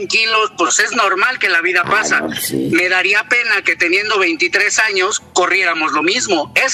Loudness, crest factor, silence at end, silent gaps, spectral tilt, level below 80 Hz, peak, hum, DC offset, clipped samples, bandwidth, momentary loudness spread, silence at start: -13 LUFS; 14 dB; 0 s; none; -1.5 dB/octave; -60 dBFS; 0 dBFS; none; under 0.1%; under 0.1%; 15 kHz; 4 LU; 0 s